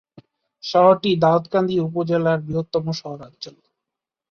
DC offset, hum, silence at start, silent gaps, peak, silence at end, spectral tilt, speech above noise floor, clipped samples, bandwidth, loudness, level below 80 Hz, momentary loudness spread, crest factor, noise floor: under 0.1%; none; 0.65 s; none; -2 dBFS; 0.8 s; -7 dB/octave; 66 dB; under 0.1%; 6.8 kHz; -19 LUFS; -58 dBFS; 20 LU; 18 dB; -85 dBFS